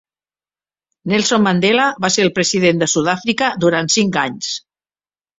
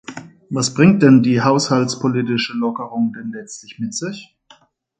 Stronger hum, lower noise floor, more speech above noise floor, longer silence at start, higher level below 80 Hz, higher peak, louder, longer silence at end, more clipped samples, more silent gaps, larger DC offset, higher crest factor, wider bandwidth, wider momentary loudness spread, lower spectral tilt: neither; first, under -90 dBFS vs -52 dBFS; first, over 75 dB vs 35 dB; first, 1.05 s vs 0.1 s; about the same, -56 dBFS vs -58 dBFS; about the same, -2 dBFS vs 0 dBFS; about the same, -15 LUFS vs -16 LUFS; about the same, 0.8 s vs 0.75 s; neither; neither; neither; about the same, 16 dB vs 18 dB; second, 8.2 kHz vs 9.4 kHz; second, 8 LU vs 20 LU; second, -3.5 dB/octave vs -5.5 dB/octave